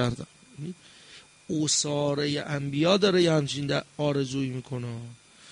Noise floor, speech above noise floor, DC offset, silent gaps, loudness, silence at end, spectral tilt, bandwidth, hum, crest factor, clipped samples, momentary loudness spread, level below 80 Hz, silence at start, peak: -52 dBFS; 25 dB; under 0.1%; none; -26 LUFS; 0 s; -4.5 dB/octave; 10.5 kHz; none; 18 dB; under 0.1%; 19 LU; -60 dBFS; 0 s; -10 dBFS